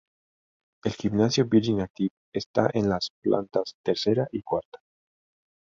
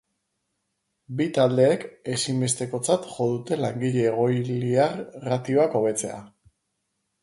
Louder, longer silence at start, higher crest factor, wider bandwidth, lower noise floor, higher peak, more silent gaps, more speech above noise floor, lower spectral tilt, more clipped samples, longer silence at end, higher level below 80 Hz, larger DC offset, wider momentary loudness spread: about the same, -26 LUFS vs -24 LUFS; second, 0.85 s vs 1.1 s; about the same, 22 dB vs 18 dB; second, 7.6 kHz vs 11.5 kHz; first, under -90 dBFS vs -77 dBFS; about the same, -6 dBFS vs -8 dBFS; first, 1.90-1.94 s, 2.11-2.32 s, 2.46-2.54 s, 3.10-3.22 s, 3.74-3.84 s, 4.65-4.72 s vs none; first, over 65 dB vs 54 dB; about the same, -6 dB/octave vs -5.5 dB/octave; neither; about the same, 1.05 s vs 0.95 s; first, -56 dBFS vs -64 dBFS; neither; about the same, 9 LU vs 8 LU